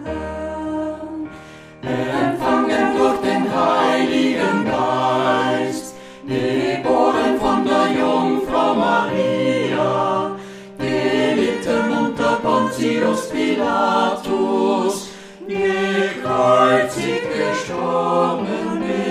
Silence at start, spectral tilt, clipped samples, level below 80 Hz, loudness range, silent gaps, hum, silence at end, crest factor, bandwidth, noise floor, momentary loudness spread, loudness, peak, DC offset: 0 s; -5 dB/octave; under 0.1%; -48 dBFS; 2 LU; none; none; 0 s; 16 dB; 14.5 kHz; -39 dBFS; 11 LU; -18 LUFS; -2 dBFS; under 0.1%